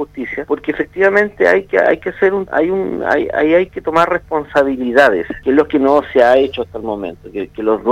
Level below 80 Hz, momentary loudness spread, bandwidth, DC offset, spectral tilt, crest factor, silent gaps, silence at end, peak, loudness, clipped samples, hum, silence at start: -44 dBFS; 11 LU; 11.5 kHz; under 0.1%; -6 dB/octave; 14 dB; none; 0 s; 0 dBFS; -14 LUFS; under 0.1%; 50 Hz at -50 dBFS; 0 s